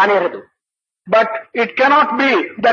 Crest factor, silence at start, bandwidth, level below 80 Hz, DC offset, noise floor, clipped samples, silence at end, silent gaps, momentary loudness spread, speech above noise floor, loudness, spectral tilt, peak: 14 dB; 0 s; 7 kHz; -66 dBFS; under 0.1%; -84 dBFS; under 0.1%; 0 s; none; 8 LU; 69 dB; -15 LUFS; -5 dB/octave; -2 dBFS